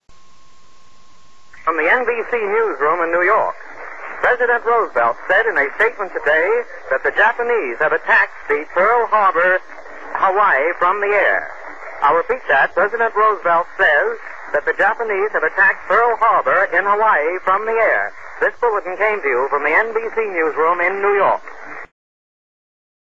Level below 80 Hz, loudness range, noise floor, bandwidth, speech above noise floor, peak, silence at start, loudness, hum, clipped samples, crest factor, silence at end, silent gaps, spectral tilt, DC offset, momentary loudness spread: -56 dBFS; 3 LU; -52 dBFS; 7.8 kHz; 35 dB; -2 dBFS; 0 s; -16 LUFS; none; under 0.1%; 16 dB; 1.2 s; none; -4.5 dB/octave; 2%; 9 LU